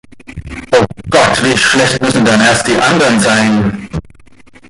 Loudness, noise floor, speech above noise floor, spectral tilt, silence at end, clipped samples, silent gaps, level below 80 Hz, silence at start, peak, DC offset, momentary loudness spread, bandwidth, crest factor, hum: -10 LUFS; -39 dBFS; 29 dB; -4 dB/octave; 0.7 s; under 0.1%; none; -36 dBFS; 0.3 s; 0 dBFS; under 0.1%; 16 LU; 11.5 kHz; 12 dB; none